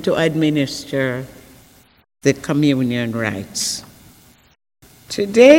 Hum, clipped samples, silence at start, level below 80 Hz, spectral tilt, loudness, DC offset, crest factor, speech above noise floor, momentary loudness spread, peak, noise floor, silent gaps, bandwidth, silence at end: none; under 0.1%; 0 s; -54 dBFS; -5 dB/octave; -19 LUFS; under 0.1%; 18 dB; 33 dB; 10 LU; 0 dBFS; -49 dBFS; none; 16.5 kHz; 0 s